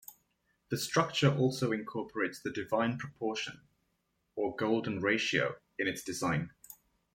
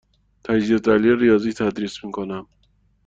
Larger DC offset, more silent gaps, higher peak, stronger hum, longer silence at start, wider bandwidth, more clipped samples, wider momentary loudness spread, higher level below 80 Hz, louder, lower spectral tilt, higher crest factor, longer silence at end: neither; neither; second, -12 dBFS vs -4 dBFS; neither; second, 0.1 s vs 0.45 s; first, 16.5 kHz vs 7.8 kHz; neither; second, 11 LU vs 15 LU; second, -68 dBFS vs -52 dBFS; second, -33 LUFS vs -20 LUFS; second, -5 dB/octave vs -6.5 dB/octave; about the same, 22 dB vs 18 dB; second, 0.4 s vs 0.65 s